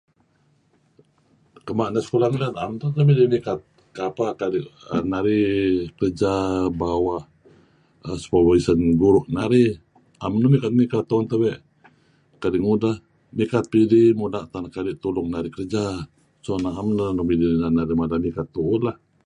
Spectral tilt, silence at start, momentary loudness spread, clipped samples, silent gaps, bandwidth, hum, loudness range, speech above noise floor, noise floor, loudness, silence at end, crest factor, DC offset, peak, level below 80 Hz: -8 dB/octave; 1.65 s; 13 LU; under 0.1%; none; 10 kHz; none; 4 LU; 42 dB; -63 dBFS; -21 LUFS; 0.3 s; 18 dB; under 0.1%; -4 dBFS; -46 dBFS